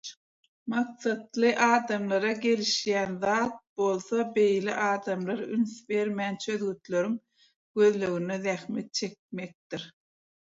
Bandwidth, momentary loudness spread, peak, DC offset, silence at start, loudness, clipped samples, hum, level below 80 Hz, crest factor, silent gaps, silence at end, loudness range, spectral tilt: 7.8 kHz; 14 LU; -10 dBFS; under 0.1%; 0.05 s; -28 LUFS; under 0.1%; none; -74 dBFS; 18 dB; 0.17-0.66 s, 3.69-3.76 s, 7.56-7.75 s, 9.19-9.29 s, 9.55-9.70 s; 0.55 s; 4 LU; -4.5 dB/octave